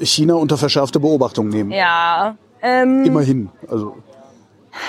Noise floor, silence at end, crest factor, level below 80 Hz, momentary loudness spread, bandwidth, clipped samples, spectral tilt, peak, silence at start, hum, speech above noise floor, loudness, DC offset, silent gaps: -48 dBFS; 0 s; 16 dB; -60 dBFS; 11 LU; 14.5 kHz; under 0.1%; -5 dB/octave; -2 dBFS; 0 s; none; 32 dB; -16 LUFS; under 0.1%; none